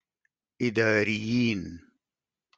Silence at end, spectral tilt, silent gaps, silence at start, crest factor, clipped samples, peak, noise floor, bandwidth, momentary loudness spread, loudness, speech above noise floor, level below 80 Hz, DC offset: 0.8 s; -6 dB/octave; none; 0.6 s; 20 dB; under 0.1%; -10 dBFS; under -90 dBFS; 7.8 kHz; 10 LU; -26 LUFS; over 64 dB; -62 dBFS; under 0.1%